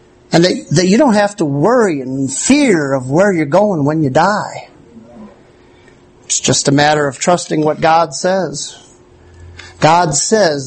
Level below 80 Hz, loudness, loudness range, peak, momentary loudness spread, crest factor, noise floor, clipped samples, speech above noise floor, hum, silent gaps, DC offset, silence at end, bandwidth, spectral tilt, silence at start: -48 dBFS; -13 LUFS; 4 LU; 0 dBFS; 7 LU; 14 dB; -44 dBFS; under 0.1%; 32 dB; none; none; under 0.1%; 0 s; 9 kHz; -4.5 dB/octave; 0.3 s